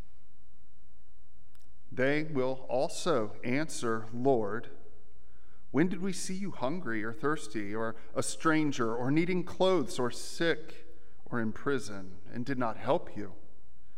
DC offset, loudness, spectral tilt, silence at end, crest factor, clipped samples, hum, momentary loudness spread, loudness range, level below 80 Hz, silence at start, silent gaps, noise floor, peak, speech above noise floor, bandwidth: 3%; -32 LUFS; -5 dB/octave; 0.55 s; 20 dB; under 0.1%; none; 11 LU; 4 LU; -64 dBFS; 1.9 s; none; -64 dBFS; -14 dBFS; 31 dB; 15.5 kHz